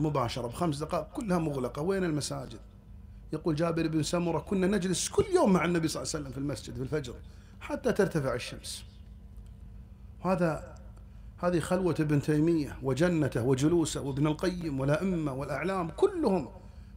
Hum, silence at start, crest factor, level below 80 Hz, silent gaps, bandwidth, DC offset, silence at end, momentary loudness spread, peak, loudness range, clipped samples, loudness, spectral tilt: none; 0 s; 18 dB; -50 dBFS; none; 16 kHz; under 0.1%; 0 s; 22 LU; -12 dBFS; 6 LU; under 0.1%; -30 LUFS; -6 dB/octave